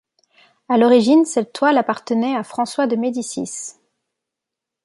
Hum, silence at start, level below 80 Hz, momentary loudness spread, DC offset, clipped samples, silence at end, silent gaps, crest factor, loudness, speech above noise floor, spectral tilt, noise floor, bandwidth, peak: none; 0.7 s; -70 dBFS; 13 LU; under 0.1%; under 0.1%; 1.15 s; none; 16 dB; -18 LUFS; 67 dB; -4.5 dB/octave; -84 dBFS; 11.5 kHz; -2 dBFS